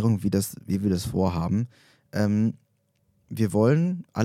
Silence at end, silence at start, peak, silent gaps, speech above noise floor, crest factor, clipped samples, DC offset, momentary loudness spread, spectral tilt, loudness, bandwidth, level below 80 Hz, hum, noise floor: 0 s; 0 s; -8 dBFS; none; 45 dB; 18 dB; under 0.1%; under 0.1%; 11 LU; -7 dB/octave; -25 LUFS; 16 kHz; -54 dBFS; none; -69 dBFS